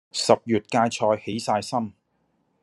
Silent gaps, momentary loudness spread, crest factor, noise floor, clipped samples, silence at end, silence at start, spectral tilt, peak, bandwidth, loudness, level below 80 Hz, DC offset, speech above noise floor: none; 8 LU; 22 dB; -70 dBFS; under 0.1%; 0.7 s; 0.15 s; -4.5 dB/octave; -2 dBFS; 12.5 kHz; -23 LUFS; -70 dBFS; under 0.1%; 47 dB